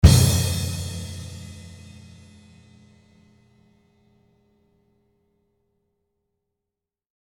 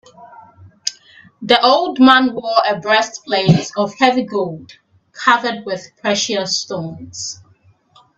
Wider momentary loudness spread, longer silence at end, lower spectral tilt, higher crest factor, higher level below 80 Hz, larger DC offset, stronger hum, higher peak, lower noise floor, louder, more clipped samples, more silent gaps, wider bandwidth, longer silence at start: first, 28 LU vs 15 LU; first, 5.55 s vs 0.85 s; about the same, -5 dB/octave vs -4 dB/octave; first, 26 dB vs 18 dB; first, -32 dBFS vs -58 dBFS; neither; neither; about the same, 0 dBFS vs 0 dBFS; first, -87 dBFS vs -53 dBFS; second, -22 LUFS vs -16 LUFS; neither; neither; first, 18 kHz vs 8.4 kHz; second, 0.05 s vs 0.2 s